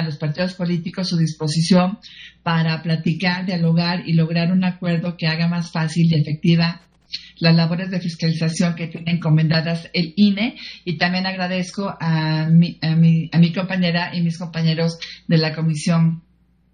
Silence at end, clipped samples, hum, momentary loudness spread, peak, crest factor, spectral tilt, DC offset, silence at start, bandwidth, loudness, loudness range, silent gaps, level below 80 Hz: 0.55 s; under 0.1%; none; 8 LU; -2 dBFS; 18 dB; -6.5 dB/octave; under 0.1%; 0 s; 10 kHz; -19 LUFS; 2 LU; none; -56 dBFS